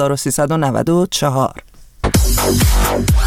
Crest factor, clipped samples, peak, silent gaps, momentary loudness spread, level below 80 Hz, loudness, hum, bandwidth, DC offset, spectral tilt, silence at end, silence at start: 14 dB; under 0.1%; 0 dBFS; none; 4 LU; -20 dBFS; -15 LUFS; none; 17.5 kHz; under 0.1%; -5 dB/octave; 0 s; 0 s